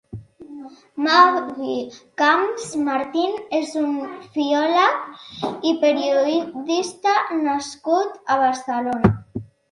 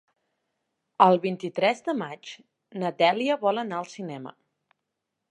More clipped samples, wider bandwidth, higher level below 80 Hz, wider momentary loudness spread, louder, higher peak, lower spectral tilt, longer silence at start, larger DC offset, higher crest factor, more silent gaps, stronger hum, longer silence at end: neither; about the same, 11.5 kHz vs 11 kHz; first, -50 dBFS vs -82 dBFS; second, 18 LU vs 21 LU; first, -20 LUFS vs -25 LUFS; about the same, 0 dBFS vs -2 dBFS; about the same, -5 dB/octave vs -5.5 dB/octave; second, 0.15 s vs 1 s; neither; about the same, 20 dB vs 24 dB; neither; neither; second, 0.25 s vs 1 s